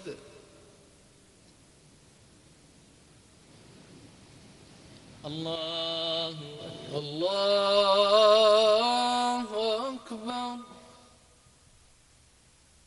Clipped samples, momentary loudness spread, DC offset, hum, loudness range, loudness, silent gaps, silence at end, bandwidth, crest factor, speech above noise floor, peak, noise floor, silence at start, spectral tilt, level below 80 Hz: under 0.1%; 21 LU; under 0.1%; none; 15 LU; -26 LUFS; none; 2.05 s; 11.5 kHz; 22 dB; 31 dB; -8 dBFS; -60 dBFS; 0 s; -3.5 dB/octave; -66 dBFS